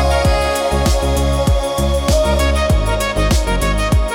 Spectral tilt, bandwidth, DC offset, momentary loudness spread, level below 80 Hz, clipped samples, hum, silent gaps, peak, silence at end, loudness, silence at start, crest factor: -5 dB/octave; 17.5 kHz; under 0.1%; 2 LU; -18 dBFS; under 0.1%; none; none; -4 dBFS; 0 s; -16 LUFS; 0 s; 10 dB